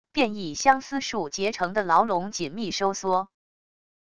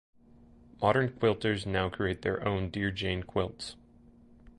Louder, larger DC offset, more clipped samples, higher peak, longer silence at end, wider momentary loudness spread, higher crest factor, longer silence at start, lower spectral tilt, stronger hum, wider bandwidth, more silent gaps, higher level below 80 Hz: first, -25 LUFS vs -31 LUFS; first, 0.4% vs under 0.1%; neither; first, -4 dBFS vs -12 dBFS; first, 0.65 s vs 0.1 s; about the same, 8 LU vs 7 LU; about the same, 22 dB vs 20 dB; second, 0.05 s vs 0.8 s; second, -3.5 dB/octave vs -6.5 dB/octave; neither; about the same, 11 kHz vs 11 kHz; neither; second, -60 dBFS vs -50 dBFS